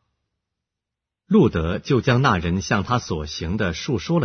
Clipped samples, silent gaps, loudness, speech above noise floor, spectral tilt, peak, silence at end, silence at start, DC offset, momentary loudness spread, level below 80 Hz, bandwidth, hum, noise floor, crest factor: under 0.1%; none; -21 LUFS; 65 dB; -6 dB/octave; -4 dBFS; 0 s; 1.3 s; under 0.1%; 8 LU; -40 dBFS; 6.6 kHz; none; -85 dBFS; 16 dB